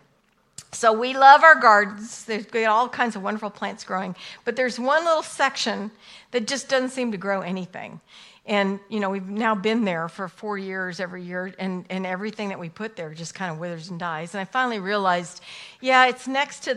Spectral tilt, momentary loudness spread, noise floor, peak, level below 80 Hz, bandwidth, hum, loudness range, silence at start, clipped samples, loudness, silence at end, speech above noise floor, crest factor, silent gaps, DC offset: -4 dB/octave; 16 LU; -64 dBFS; 0 dBFS; -72 dBFS; 12 kHz; none; 13 LU; 0.6 s; under 0.1%; -22 LUFS; 0 s; 41 dB; 22 dB; none; under 0.1%